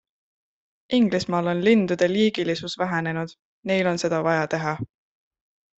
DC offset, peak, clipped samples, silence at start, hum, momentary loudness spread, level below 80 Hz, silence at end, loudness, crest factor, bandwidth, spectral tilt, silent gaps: under 0.1%; -6 dBFS; under 0.1%; 0.9 s; none; 11 LU; -64 dBFS; 0.9 s; -23 LUFS; 18 dB; 8.2 kHz; -6 dB/octave; 3.39-3.63 s